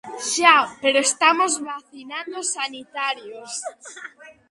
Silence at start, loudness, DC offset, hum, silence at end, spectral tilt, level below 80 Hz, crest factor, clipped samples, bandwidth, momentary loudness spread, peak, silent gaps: 0.05 s; -20 LUFS; under 0.1%; none; 0.2 s; 0.5 dB/octave; -74 dBFS; 22 dB; under 0.1%; 11.5 kHz; 20 LU; 0 dBFS; none